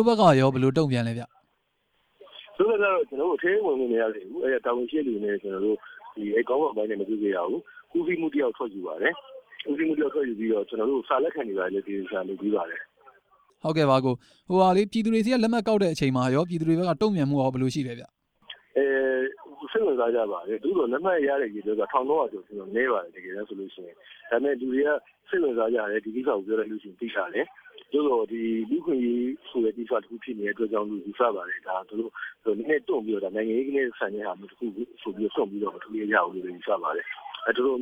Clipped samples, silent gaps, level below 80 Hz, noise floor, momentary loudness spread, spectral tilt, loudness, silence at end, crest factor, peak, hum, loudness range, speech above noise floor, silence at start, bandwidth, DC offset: under 0.1%; none; -66 dBFS; -73 dBFS; 12 LU; -7 dB/octave; -26 LUFS; 0 s; 20 dB; -6 dBFS; none; 5 LU; 47 dB; 0 s; 11 kHz; under 0.1%